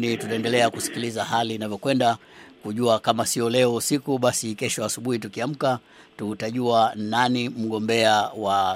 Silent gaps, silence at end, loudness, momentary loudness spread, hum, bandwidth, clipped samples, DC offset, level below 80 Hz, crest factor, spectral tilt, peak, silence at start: none; 0 s; -23 LUFS; 8 LU; none; 16 kHz; under 0.1%; under 0.1%; -68 dBFS; 20 dB; -4 dB/octave; -2 dBFS; 0 s